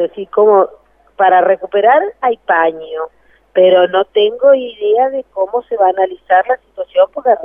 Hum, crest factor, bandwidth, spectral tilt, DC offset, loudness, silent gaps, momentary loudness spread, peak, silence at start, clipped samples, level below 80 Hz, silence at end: none; 12 dB; 3.6 kHz; -7 dB/octave; under 0.1%; -13 LUFS; none; 9 LU; 0 dBFS; 0 s; under 0.1%; -60 dBFS; 0 s